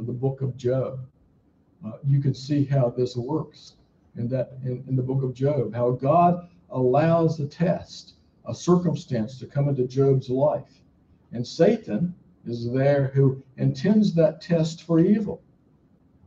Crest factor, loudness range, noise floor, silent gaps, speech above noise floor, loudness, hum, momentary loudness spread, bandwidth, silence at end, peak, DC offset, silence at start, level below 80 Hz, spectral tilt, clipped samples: 18 dB; 4 LU; -61 dBFS; none; 38 dB; -24 LUFS; none; 14 LU; 7.6 kHz; 0.9 s; -6 dBFS; under 0.1%; 0 s; -58 dBFS; -8.5 dB/octave; under 0.1%